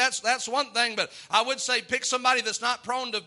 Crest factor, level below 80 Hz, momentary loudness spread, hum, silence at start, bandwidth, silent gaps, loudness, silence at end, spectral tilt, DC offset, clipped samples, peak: 20 dB; -76 dBFS; 5 LU; none; 0 s; 11.5 kHz; none; -25 LUFS; 0 s; 0 dB/octave; under 0.1%; under 0.1%; -6 dBFS